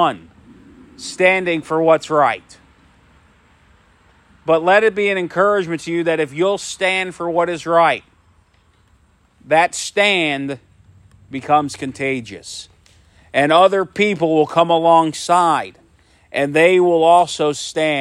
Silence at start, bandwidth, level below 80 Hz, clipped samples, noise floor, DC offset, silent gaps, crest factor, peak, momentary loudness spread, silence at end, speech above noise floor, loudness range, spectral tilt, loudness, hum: 0 s; 13.5 kHz; -58 dBFS; under 0.1%; -55 dBFS; under 0.1%; none; 16 dB; 0 dBFS; 15 LU; 0 s; 40 dB; 5 LU; -4 dB/octave; -16 LUFS; none